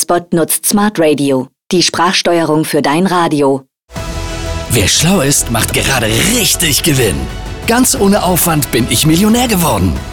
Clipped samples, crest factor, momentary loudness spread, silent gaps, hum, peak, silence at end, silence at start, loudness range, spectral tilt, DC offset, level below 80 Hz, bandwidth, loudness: under 0.1%; 12 dB; 11 LU; 3.84-3.88 s; none; 0 dBFS; 0 s; 0 s; 2 LU; -3.5 dB/octave; under 0.1%; -28 dBFS; over 20 kHz; -11 LUFS